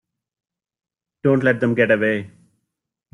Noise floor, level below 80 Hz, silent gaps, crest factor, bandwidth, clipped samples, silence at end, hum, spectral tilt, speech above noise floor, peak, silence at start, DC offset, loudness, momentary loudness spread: -80 dBFS; -62 dBFS; none; 18 dB; 11 kHz; under 0.1%; 0.85 s; none; -8 dB/octave; 62 dB; -4 dBFS; 1.25 s; under 0.1%; -19 LUFS; 6 LU